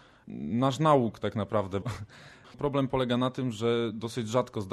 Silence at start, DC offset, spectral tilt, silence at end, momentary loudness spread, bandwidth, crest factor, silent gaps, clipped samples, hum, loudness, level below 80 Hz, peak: 0.25 s; under 0.1%; -6.5 dB/octave; 0 s; 14 LU; 13 kHz; 18 dB; none; under 0.1%; none; -29 LUFS; -58 dBFS; -10 dBFS